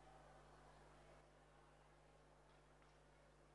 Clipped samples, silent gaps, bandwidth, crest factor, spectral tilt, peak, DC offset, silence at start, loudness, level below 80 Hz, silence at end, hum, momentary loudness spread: under 0.1%; none; 11 kHz; 14 dB; -5 dB/octave; -54 dBFS; under 0.1%; 0 s; -67 LUFS; -76 dBFS; 0 s; 50 Hz at -75 dBFS; 2 LU